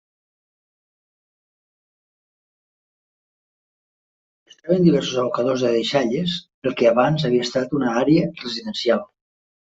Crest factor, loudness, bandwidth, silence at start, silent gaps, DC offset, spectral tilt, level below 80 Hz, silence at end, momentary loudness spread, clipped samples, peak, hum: 20 dB; -20 LUFS; 8 kHz; 4.65 s; 6.54-6.62 s; under 0.1%; -6 dB/octave; -60 dBFS; 0.55 s; 9 LU; under 0.1%; -4 dBFS; none